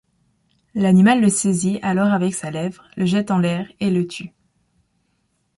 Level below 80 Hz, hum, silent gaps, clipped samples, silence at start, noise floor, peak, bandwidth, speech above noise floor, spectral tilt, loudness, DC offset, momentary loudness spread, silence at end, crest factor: -58 dBFS; none; none; under 0.1%; 0.75 s; -68 dBFS; -4 dBFS; 11.5 kHz; 50 dB; -5.5 dB/octave; -19 LUFS; under 0.1%; 14 LU; 1.3 s; 16 dB